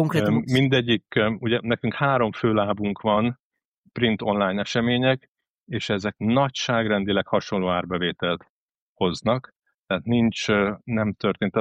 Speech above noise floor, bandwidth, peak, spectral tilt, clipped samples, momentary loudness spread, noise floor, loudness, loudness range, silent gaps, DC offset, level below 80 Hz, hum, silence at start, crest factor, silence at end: 43 dB; 9.6 kHz; -8 dBFS; -6 dB/octave; under 0.1%; 6 LU; -66 dBFS; -23 LUFS; 3 LU; 3.40-3.51 s, 3.65-3.72 s, 3.78-3.84 s, 5.28-5.35 s, 5.49-5.66 s, 8.50-8.96 s, 9.56-9.60 s, 9.74-9.82 s; under 0.1%; -56 dBFS; none; 0 s; 16 dB; 0 s